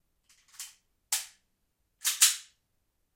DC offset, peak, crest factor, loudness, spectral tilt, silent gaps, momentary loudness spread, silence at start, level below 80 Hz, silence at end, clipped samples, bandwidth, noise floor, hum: under 0.1%; -6 dBFS; 28 dB; -27 LUFS; 6.5 dB/octave; none; 22 LU; 0.6 s; -80 dBFS; 0.75 s; under 0.1%; 16.5 kHz; -77 dBFS; none